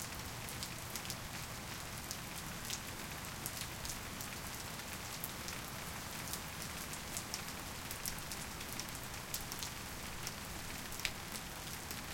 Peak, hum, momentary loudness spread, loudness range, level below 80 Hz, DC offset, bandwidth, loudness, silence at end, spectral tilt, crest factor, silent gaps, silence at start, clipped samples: -16 dBFS; none; 3 LU; 1 LU; -56 dBFS; under 0.1%; 17 kHz; -43 LUFS; 0 s; -2.5 dB/octave; 30 dB; none; 0 s; under 0.1%